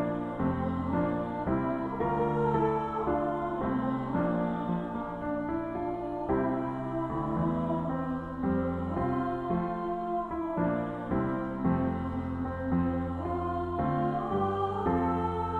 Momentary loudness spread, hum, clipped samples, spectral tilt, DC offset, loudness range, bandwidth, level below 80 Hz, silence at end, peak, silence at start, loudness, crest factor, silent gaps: 5 LU; none; under 0.1%; -10 dB/octave; under 0.1%; 2 LU; 4.5 kHz; -48 dBFS; 0 s; -16 dBFS; 0 s; -31 LUFS; 14 dB; none